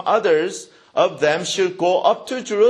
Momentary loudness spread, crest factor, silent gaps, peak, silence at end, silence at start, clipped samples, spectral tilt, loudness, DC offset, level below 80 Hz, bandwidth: 9 LU; 16 dB; none; -2 dBFS; 0 s; 0 s; under 0.1%; -3.5 dB/octave; -19 LUFS; under 0.1%; -66 dBFS; 12 kHz